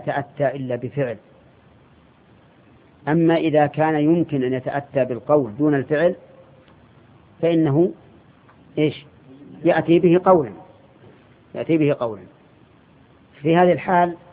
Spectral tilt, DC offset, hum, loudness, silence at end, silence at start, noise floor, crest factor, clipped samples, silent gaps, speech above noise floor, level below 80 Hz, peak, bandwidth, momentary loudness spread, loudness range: -12 dB/octave; under 0.1%; none; -20 LUFS; 0.15 s; 0 s; -52 dBFS; 20 dB; under 0.1%; none; 34 dB; -60 dBFS; -2 dBFS; 4.6 kHz; 12 LU; 5 LU